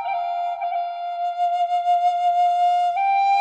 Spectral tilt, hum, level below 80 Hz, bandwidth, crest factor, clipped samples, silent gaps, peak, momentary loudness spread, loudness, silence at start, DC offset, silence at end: 0 dB/octave; none; -86 dBFS; 8.4 kHz; 10 dB; under 0.1%; none; -12 dBFS; 8 LU; -21 LUFS; 0 s; under 0.1%; 0 s